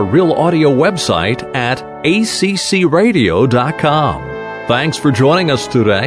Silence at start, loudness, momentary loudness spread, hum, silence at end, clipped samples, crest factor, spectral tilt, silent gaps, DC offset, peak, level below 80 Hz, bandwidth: 0 s; -13 LUFS; 6 LU; none; 0 s; under 0.1%; 12 dB; -5.5 dB/octave; none; under 0.1%; 0 dBFS; -42 dBFS; 11 kHz